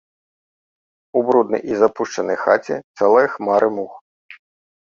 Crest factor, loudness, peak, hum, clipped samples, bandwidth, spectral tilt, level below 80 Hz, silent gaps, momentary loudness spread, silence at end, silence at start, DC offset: 18 dB; -18 LUFS; -2 dBFS; none; under 0.1%; 7.4 kHz; -5.5 dB/octave; -64 dBFS; 2.84-2.94 s, 4.01-4.29 s; 9 LU; 0.55 s; 1.15 s; under 0.1%